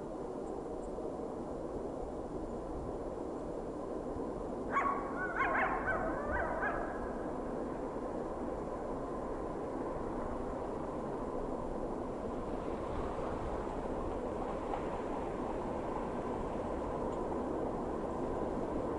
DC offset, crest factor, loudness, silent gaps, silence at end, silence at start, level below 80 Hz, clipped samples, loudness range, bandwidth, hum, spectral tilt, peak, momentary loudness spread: under 0.1%; 16 dB; -39 LUFS; none; 0 s; 0 s; -50 dBFS; under 0.1%; 6 LU; 11.5 kHz; none; -7 dB/octave; -22 dBFS; 7 LU